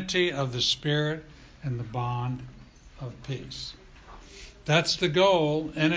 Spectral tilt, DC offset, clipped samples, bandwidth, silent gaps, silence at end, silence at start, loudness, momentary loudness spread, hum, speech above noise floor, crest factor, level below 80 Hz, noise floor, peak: -5 dB/octave; under 0.1%; under 0.1%; 8 kHz; none; 0 s; 0 s; -27 LUFS; 20 LU; none; 21 dB; 20 dB; -52 dBFS; -48 dBFS; -8 dBFS